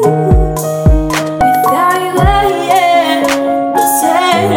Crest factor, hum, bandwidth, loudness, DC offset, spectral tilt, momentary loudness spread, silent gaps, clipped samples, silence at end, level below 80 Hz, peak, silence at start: 10 dB; none; 17.5 kHz; -11 LUFS; under 0.1%; -5 dB/octave; 3 LU; none; 0.2%; 0 s; -20 dBFS; 0 dBFS; 0 s